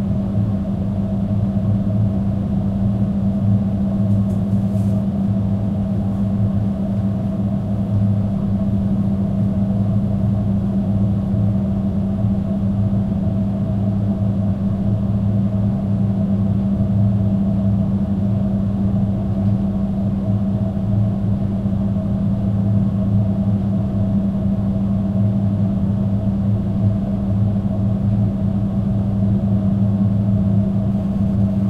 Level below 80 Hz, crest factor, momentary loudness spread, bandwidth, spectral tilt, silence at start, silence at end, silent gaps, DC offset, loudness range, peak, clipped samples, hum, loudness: -34 dBFS; 12 dB; 2 LU; 4.2 kHz; -11 dB/octave; 0 s; 0 s; none; under 0.1%; 1 LU; -6 dBFS; under 0.1%; none; -19 LUFS